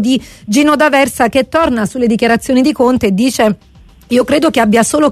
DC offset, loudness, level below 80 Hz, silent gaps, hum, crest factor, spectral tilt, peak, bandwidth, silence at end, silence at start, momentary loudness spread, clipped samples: under 0.1%; -11 LUFS; -40 dBFS; none; none; 10 dB; -4.5 dB/octave; 0 dBFS; 13.5 kHz; 0 s; 0 s; 5 LU; under 0.1%